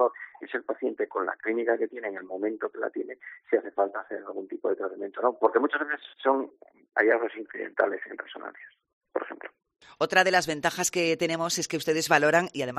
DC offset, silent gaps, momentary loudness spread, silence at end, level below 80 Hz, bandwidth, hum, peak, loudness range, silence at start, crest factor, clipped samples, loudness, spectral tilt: under 0.1%; 8.93-9.01 s; 15 LU; 0 s; -74 dBFS; 14 kHz; none; -6 dBFS; 5 LU; 0 s; 22 dB; under 0.1%; -27 LUFS; -3 dB/octave